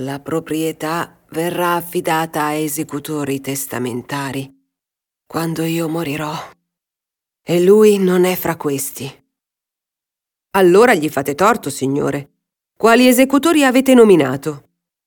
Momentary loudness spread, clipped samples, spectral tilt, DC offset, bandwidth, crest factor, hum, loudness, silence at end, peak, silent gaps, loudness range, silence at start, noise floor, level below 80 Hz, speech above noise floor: 15 LU; under 0.1%; -5 dB/octave; under 0.1%; 19 kHz; 16 dB; none; -16 LUFS; 0.45 s; 0 dBFS; none; 10 LU; 0 s; -86 dBFS; -56 dBFS; 71 dB